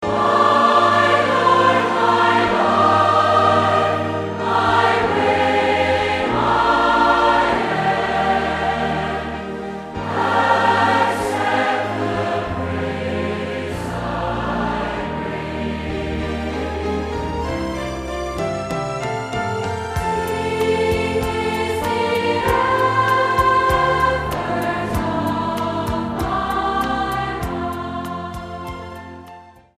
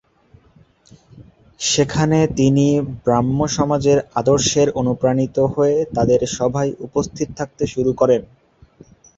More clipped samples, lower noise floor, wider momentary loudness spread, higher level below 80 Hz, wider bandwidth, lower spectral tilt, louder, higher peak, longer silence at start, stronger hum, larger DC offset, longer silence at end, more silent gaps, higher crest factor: neither; second, -42 dBFS vs -52 dBFS; first, 11 LU vs 8 LU; first, -38 dBFS vs -44 dBFS; first, 15.5 kHz vs 8 kHz; about the same, -5.5 dB/octave vs -5.5 dB/octave; about the same, -18 LUFS vs -18 LUFS; about the same, -2 dBFS vs -2 dBFS; second, 0 s vs 1.15 s; neither; neither; second, 0.3 s vs 0.95 s; neither; about the same, 16 dB vs 16 dB